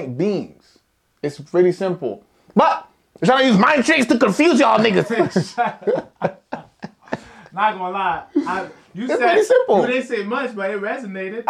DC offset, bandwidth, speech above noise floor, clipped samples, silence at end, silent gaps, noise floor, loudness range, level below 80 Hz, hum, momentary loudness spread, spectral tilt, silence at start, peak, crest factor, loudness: under 0.1%; 13 kHz; 43 dB; under 0.1%; 0.05 s; none; -61 dBFS; 8 LU; -62 dBFS; none; 17 LU; -5.5 dB/octave; 0 s; -2 dBFS; 16 dB; -18 LUFS